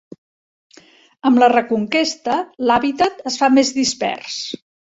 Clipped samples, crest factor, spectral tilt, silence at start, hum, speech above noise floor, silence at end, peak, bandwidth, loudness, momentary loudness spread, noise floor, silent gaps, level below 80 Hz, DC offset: under 0.1%; 18 dB; -3 dB/octave; 1.25 s; none; 32 dB; 0.4 s; -2 dBFS; 8 kHz; -17 LUFS; 12 LU; -49 dBFS; none; -58 dBFS; under 0.1%